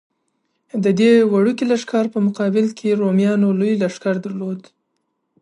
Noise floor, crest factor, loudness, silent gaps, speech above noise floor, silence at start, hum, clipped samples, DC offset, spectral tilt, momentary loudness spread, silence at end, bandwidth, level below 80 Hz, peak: -72 dBFS; 14 dB; -18 LUFS; none; 55 dB; 0.75 s; none; under 0.1%; under 0.1%; -7 dB/octave; 13 LU; 0.8 s; 10.5 kHz; -68 dBFS; -4 dBFS